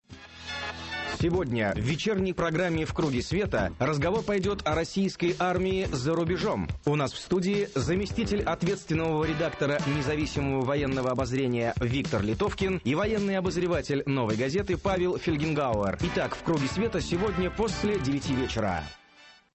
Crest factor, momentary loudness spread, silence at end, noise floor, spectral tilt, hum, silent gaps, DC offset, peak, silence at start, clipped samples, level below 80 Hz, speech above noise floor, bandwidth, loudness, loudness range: 12 dB; 2 LU; 0.25 s; -55 dBFS; -6 dB/octave; none; none; under 0.1%; -16 dBFS; 0.1 s; under 0.1%; -44 dBFS; 28 dB; 8.6 kHz; -28 LUFS; 1 LU